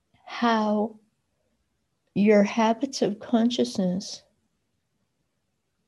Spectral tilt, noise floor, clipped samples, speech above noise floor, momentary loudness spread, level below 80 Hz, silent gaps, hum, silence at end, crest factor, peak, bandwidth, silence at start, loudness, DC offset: -5.5 dB/octave; -77 dBFS; under 0.1%; 54 dB; 13 LU; -70 dBFS; none; none; 1.7 s; 18 dB; -8 dBFS; 11.5 kHz; 0.25 s; -24 LUFS; under 0.1%